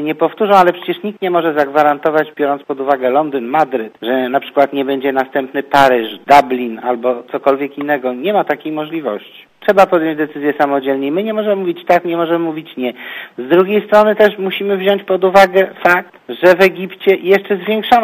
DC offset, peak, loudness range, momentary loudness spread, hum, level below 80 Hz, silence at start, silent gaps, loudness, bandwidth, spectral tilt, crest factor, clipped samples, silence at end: under 0.1%; 0 dBFS; 4 LU; 10 LU; none; -56 dBFS; 0 s; none; -14 LUFS; 15.5 kHz; -6 dB/octave; 14 dB; 0.3%; 0 s